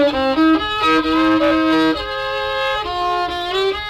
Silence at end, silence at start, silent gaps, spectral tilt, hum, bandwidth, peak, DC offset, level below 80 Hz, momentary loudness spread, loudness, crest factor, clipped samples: 0 s; 0 s; none; -4.5 dB/octave; none; 12 kHz; -4 dBFS; under 0.1%; -40 dBFS; 6 LU; -17 LUFS; 12 dB; under 0.1%